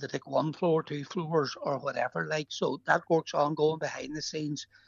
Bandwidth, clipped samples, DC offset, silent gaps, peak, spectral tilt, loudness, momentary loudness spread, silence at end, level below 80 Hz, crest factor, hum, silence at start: 7.6 kHz; under 0.1%; under 0.1%; none; -12 dBFS; -5 dB/octave; -31 LUFS; 8 LU; 0.25 s; -72 dBFS; 20 dB; none; 0 s